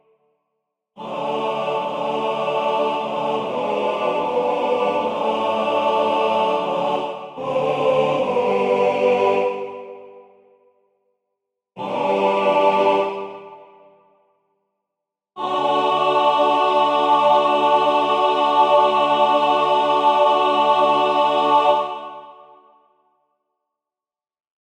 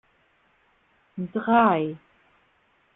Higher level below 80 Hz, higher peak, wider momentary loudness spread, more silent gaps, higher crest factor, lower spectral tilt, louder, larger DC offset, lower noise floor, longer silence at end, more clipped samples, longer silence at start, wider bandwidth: about the same, -68 dBFS vs -66 dBFS; about the same, -4 dBFS vs -6 dBFS; second, 12 LU vs 23 LU; neither; about the same, 16 dB vs 20 dB; second, -5 dB/octave vs -10 dB/octave; first, -18 LUFS vs -23 LUFS; neither; first, under -90 dBFS vs -65 dBFS; first, 2.35 s vs 1 s; neither; second, 0.95 s vs 1.15 s; first, 10 kHz vs 4 kHz